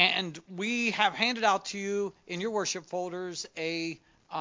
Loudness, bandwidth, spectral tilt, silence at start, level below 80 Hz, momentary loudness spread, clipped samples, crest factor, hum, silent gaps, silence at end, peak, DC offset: -30 LUFS; 7.6 kHz; -3 dB/octave; 0 s; -74 dBFS; 11 LU; under 0.1%; 24 dB; none; none; 0 s; -8 dBFS; under 0.1%